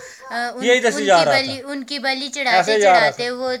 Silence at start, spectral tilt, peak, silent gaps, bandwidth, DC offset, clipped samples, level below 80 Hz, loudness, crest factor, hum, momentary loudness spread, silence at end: 0 s; -2.5 dB/octave; -2 dBFS; none; 15 kHz; under 0.1%; under 0.1%; -70 dBFS; -17 LUFS; 16 dB; none; 12 LU; 0 s